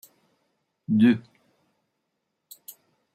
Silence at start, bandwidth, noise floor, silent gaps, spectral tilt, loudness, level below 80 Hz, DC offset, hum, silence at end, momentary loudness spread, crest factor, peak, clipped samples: 0.9 s; 16 kHz; -79 dBFS; none; -7 dB/octave; -22 LUFS; -74 dBFS; under 0.1%; none; 1.95 s; 25 LU; 20 dB; -8 dBFS; under 0.1%